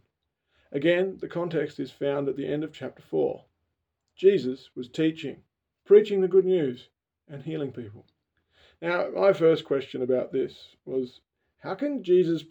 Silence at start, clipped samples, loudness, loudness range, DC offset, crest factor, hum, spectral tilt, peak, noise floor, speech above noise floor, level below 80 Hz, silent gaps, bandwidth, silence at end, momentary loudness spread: 0.7 s; under 0.1%; -26 LUFS; 5 LU; under 0.1%; 20 dB; none; -7.5 dB/octave; -6 dBFS; -80 dBFS; 55 dB; -72 dBFS; none; 7.8 kHz; 0.05 s; 17 LU